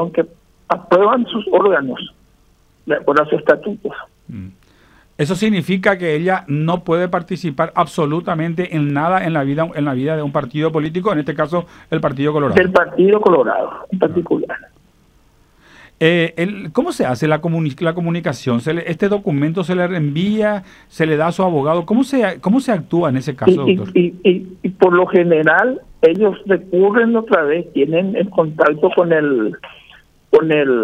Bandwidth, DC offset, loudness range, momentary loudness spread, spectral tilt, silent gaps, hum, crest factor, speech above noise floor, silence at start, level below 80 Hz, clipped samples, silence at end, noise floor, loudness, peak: 12.5 kHz; under 0.1%; 5 LU; 9 LU; -7 dB/octave; none; none; 16 dB; 38 dB; 0 s; -52 dBFS; under 0.1%; 0 s; -53 dBFS; -16 LUFS; 0 dBFS